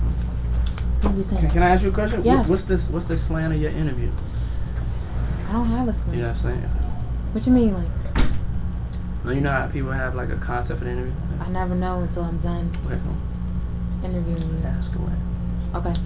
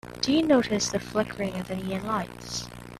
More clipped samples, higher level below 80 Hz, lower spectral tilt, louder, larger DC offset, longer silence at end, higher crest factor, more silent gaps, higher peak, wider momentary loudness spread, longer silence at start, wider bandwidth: neither; first, -26 dBFS vs -52 dBFS; first, -12 dB/octave vs -4.5 dB/octave; first, -24 LUFS vs -27 LUFS; neither; about the same, 0 s vs 0 s; about the same, 18 dB vs 18 dB; neither; first, -4 dBFS vs -10 dBFS; about the same, 10 LU vs 12 LU; about the same, 0 s vs 0.05 s; second, 4 kHz vs 14.5 kHz